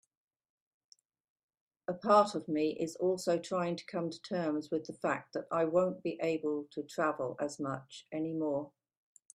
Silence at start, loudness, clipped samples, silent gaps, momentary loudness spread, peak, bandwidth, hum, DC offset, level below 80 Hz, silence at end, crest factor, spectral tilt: 1.9 s; -34 LUFS; under 0.1%; none; 11 LU; -12 dBFS; 13.5 kHz; none; under 0.1%; -80 dBFS; 0.7 s; 22 dB; -6 dB/octave